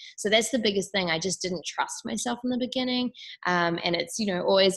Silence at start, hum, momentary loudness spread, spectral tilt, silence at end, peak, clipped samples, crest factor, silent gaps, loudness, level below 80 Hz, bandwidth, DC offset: 0 s; none; 7 LU; -3.5 dB/octave; 0 s; -8 dBFS; under 0.1%; 18 dB; none; -27 LUFS; -64 dBFS; 13 kHz; under 0.1%